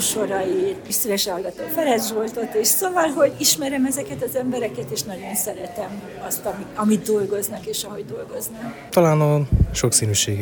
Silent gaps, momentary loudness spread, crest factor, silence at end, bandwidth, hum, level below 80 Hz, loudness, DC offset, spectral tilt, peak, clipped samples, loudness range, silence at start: none; 13 LU; 20 dB; 0 s; 19.5 kHz; none; -36 dBFS; -21 LUFS; under 0.1%; -4 dB/octave; -2 dBFS; under 0.1%; 5 LU; 0 s